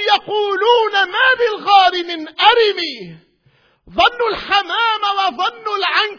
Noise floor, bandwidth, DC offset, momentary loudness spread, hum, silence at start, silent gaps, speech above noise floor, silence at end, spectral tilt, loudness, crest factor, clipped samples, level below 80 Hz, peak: -57 dBFS; 5.4 kHz; under 0.1%; 10 LU; none; 0 s; none; 40 dB; 0 s; -2.5 dB/octave; -15 LUFS; 16 dB; under 0.1%; -52 dBFS; 0 dBFS